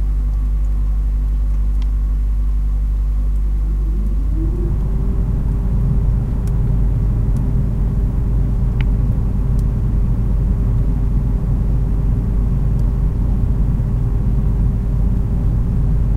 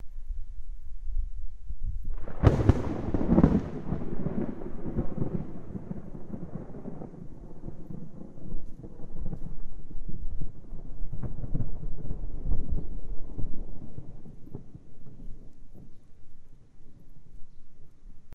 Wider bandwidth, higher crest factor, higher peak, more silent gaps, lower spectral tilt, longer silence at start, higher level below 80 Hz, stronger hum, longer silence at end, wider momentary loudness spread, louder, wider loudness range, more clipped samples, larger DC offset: second, 2.9 kHz vs 3.9 kHz; second, 12 dB vs 22 dB; about the same, -4 dBFS vs -4 dBFS; neither; about the same, -10 dB/octave vs -9.5 dB/octave; about the same, 0 s vs 0 s; first, -16 dBFS vs -34 dBFS; neither; about the same, 0 s vs 0 s; second, 2 LU vs 22 LU; first, -19 LUFS vs -33 LUFS; second, 2 LU vs 19 LU; neither; neither